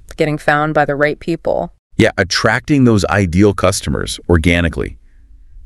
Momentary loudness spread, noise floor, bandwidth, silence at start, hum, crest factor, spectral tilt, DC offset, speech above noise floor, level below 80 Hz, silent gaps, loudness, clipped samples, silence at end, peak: 8 LU; -41 dBFS; 13.5 kHz; 0.1 s; none; 14 dB; -5.5 dB/octave; under 0.1%; 28 dB; -30 dBFS; 1.79-1.90 s; -14 LUFS; under 0.1%; 0.05 s; 0 dBFS